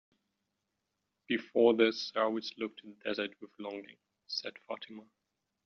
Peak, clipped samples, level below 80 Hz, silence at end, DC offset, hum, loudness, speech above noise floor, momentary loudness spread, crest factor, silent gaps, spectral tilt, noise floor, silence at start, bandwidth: -14 dBFS; under 0.1%; -82 dBFS; 0.65 s; under 0.1%; none; -34 LUFS; 51 dB; 17 LU; 22 dB; none; -2 dB/octave; -85 dBFS; 1.3 s; 6.8 kHz